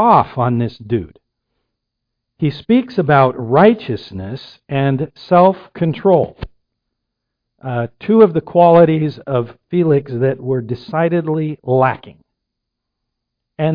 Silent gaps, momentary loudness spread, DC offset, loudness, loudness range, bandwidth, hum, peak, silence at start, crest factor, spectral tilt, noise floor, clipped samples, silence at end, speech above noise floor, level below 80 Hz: none; 13 LU; under 0.1%; -15 LUFS; 4 LU; 5.2 kHz; none; 0 dBFS; 0 s; 16 dB; -10.5 dB/octave; -78 dBFS; under 0.1%; 0 s; 63 dB; -48 dBFS